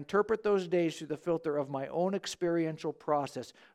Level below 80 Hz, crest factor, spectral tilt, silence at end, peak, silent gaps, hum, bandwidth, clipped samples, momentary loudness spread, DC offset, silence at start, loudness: -70 dBFS; 16 dB; -6 dB/octave; 0.25 s; -16 dBFS; none; none; 14 kHz; under 0.1%; 8 LU; under 0.1%; 0 s; -33 LUFS